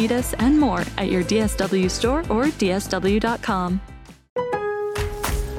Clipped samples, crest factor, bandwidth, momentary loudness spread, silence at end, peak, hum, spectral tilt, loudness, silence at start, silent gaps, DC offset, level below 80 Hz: under 0.1%; 18 dB; 16.5 kHz; 7 LU; 0 s; -4 dBFS; none; -5 dB/octave; -22 LUFS; 0 s; 4.30-4.36 s; under 0.1%; -34 dBFS